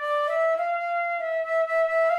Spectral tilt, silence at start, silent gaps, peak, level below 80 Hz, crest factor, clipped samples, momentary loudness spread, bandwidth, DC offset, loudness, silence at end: -1 dB/octave; 0 s; none; -14 dBFS; -72 dBFS; 10 dB; under 0.1%; 4 LU; 11.5 kHz; under 0.1%; -25 LUFS; 0 s